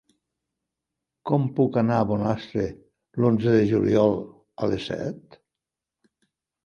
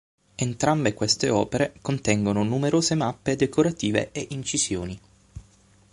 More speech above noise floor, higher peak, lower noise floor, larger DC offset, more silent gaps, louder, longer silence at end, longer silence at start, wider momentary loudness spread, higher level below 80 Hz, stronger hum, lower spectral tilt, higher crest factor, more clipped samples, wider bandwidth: first, 65 dB vs 33 dB; about the same, -6 dBFS vs -6 dBFS; first, -87 dBFS vs -57 dBFS; neither; neither; about the same, -24 LUFS vs -24 LUFS; first, 1.45 s vs 0.55 s; first, 1.25 s vs 0.4 s; first, 14 LU vs 9 LU; about the same, -54 dBFS vs -50 dBFS; neither; first, -8.5 dB/octave vs -4.5 dB/octave; about the same, 20 dB vs 20 dB; neither; second, 7 kHz vs 11.5 kHz